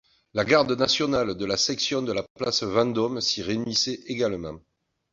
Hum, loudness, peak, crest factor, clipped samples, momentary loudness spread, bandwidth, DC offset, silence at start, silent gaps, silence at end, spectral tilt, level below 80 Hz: none; -24 LUFS; -6 dBFS; 20 dB; under 0.1%; 8 LU; 7.8 kHz; under 0.1%; 0.35 s; 2.30-2.35 s; 0.55 s; -3.5 dB/octave; -56 dBFS